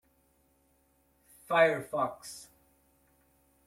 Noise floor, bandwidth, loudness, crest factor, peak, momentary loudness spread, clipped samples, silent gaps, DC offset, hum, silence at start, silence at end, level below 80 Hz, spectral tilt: -70 dBFS; 16 kHz; -29 LUFS; 22 dB; -12 dBFS; 20 LU; under 0.1%; none; under 0.1%; none; 1.5 s; 1.25 s; -72 dBFS; -4 dB/octave